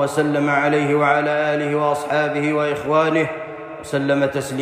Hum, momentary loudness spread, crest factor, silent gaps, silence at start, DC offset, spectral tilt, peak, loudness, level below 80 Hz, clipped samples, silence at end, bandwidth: none; 8 LU; 14 dB; none; 0 s; under 0.1%; -6 dB/octave; -4 dBFS; -19 LUFS; -58 dBFS; under 0.1%; 0 s; 15.5 kHz